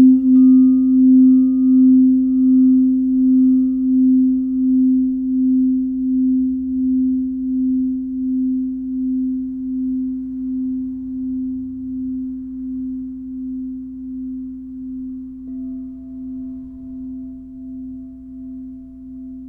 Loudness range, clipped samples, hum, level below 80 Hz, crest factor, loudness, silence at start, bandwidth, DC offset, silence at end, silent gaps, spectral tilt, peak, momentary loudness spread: 18 LU; under 0.1%; none; -46 dBFS; 14 dB; -16 LUFS; 0 s; 1.3 kHz; under 0.1%; 0 s; none; -12.5 dB/octave; -4 dBFS; 20 LU